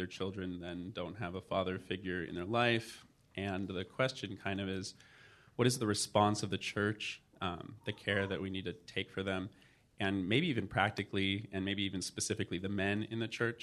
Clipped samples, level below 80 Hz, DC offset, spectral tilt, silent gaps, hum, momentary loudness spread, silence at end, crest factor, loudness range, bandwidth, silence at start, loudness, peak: under 0.1%; -70 dBFS; under 0.1%; -4.5 dB/octave; none; none; 10 LU; 0 s; 24 dB; 3 LU; 13 kHz; 0 s; -36 LUFS; -14 dBFS